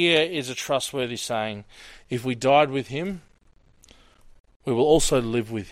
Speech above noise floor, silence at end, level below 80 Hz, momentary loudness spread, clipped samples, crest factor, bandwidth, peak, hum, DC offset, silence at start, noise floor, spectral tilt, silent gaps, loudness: 34 dB; 0 s; -44 dBFS; 14 LU; under 0.1%; 20 dB; 16 kHz; -6 dBFS; none; under 0.1%; 0 s; -57 dBFS; -4 dB/octave; 4.40-4.44 s, 4.56-4.60 s; -24 LUFS